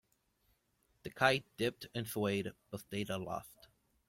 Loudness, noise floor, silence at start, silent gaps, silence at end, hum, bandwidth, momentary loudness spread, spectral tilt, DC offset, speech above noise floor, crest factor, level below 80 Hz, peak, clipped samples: -37 LUFS; -77 dBFS; 1.05 s; none; 0.55 s; none; 16.5 kHz; 18 LU; -4.5 dB/octave; under 0.1%; 40 dB; 26 dB; -70 dBFS; -14 dBFS; under 0.1%